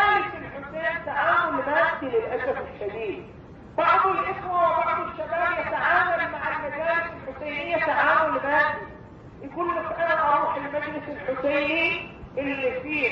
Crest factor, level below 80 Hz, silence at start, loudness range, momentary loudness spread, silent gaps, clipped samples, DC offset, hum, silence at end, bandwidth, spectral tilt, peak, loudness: 18 dB; -54 dBFS; 0 s; 2 LU; 12 LU; none; under 0.1%; under 0.1%; none; 0 s; 6.8 kHz; -6.5 dB/octave; -8 dBFS; -24 LUFS